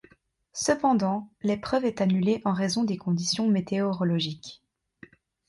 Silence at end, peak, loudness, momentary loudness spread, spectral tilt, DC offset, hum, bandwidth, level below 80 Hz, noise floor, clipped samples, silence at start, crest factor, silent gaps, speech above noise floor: 0.95 s; -10 dBFS; -26 LUFS; 6 LU; -5.5 dB/octave; under 0.1%; none; 11.5 kHz; -62 dBFS; -62 dBFS; under 0.1%; 0.55 s; 18 dB; none; 37 dB